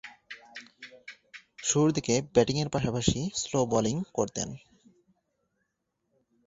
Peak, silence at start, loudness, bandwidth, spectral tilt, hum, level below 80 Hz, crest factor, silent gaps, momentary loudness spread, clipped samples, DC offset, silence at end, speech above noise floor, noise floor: -8 dBFS; 0.05 s; -28 LUFS; 8 kHz; -4.5 dB/octave; none; -54 dBFS; 22 dB; none; 22 LU; under 0.1%; under 0.1%; 1.9 s; 53 dB; -80 dBFS